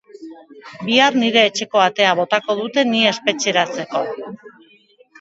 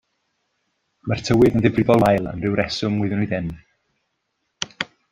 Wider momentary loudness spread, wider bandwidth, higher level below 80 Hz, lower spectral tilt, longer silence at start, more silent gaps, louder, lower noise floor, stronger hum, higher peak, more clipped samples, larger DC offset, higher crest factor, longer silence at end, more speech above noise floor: second, 11 LU vs 15 LU; second, 8 kHz vs 16 kHz; second, -70 dBFS vs -46 dBFS; second, -3 dB/octave vs -6.5 dB/octave; second, 0.2 s vs 1.05 s; neither; first, -16 LUFS vs -20 LUFS; second, -52 dBFS vs -74 dBFS; neither; about the same, 0 dBFS vs -2 dBFS; neither; neither; about the same, 18 dB vs 20 dB; first, 0.7 s vs 0.3 s; second, 35 dB vs 55 dB